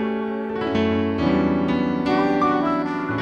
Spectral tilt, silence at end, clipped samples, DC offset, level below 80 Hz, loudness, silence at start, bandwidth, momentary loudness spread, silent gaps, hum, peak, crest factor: -8 dB/octave; 0 s; under 0.1%; under 0.1%; -46 dBFS; -21 LUFS; 0 s; 7.2 kHz; 6 LU; none; none; -8 dBFS; 14 dB